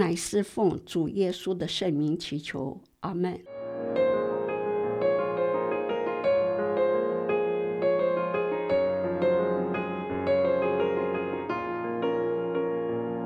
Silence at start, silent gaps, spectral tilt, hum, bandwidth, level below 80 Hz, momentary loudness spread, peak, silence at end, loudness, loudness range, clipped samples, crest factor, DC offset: 0 s; none; -6 dB/octave; none; 13 kHz; -62 dBFS; 6 LU; -10 dBFS; 0 s; -28 LUFS; 3 LU; under 0.1%; 18 dB; under 0.1%